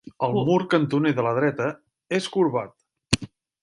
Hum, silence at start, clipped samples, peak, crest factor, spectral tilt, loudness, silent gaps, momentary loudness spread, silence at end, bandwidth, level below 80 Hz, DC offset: none; 0.05 s; under 0.1%; -2 dBFS; 22 dB; -5.5 dB/octave; -24 LUFS; none; 9 LU; 0.35 s; 11.5 kHz; -52 dBFS; under 0.1%